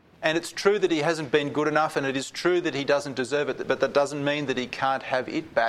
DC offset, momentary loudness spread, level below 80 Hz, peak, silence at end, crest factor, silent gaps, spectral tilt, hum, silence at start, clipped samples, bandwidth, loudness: under 0.1%; 4 LU; -64 dBFS; -4 dBFS; 0 s; 20 dB; none; -4.5 dB/octave; none; 0.2 s; under 0.1%; 14 kHz; -25 LUFS